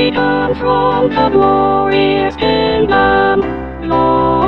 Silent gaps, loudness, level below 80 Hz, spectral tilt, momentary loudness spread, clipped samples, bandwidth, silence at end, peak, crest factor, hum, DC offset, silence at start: none; -12 LUFS; -32 dBFS; -8 dB/octave; 4 LU; under 0.1%; 6 kHz; 0 s; 0 dBFS; 12 dB; none; 0.8%; 0 s